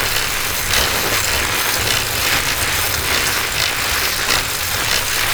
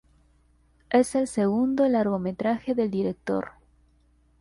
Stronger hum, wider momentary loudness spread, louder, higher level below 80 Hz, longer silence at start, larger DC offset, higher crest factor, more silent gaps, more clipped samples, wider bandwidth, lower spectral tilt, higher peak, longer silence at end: neither; second, 2 LU vs 7 LU; first, -16 LUFS vs -25 LUFS; first, -32 dBFS vs -58 dBFS; second, 0 s vs 0.9 s; neither; about the same, 16 dB vs 18 dB; neither; neither; first, over 20 kHz vs 11.5 kHz; second, -1 dB/octave vs -6.5 dB/octave; first, -2 dBFS vs -8 dBFS; second, 0 s vs 0.9 s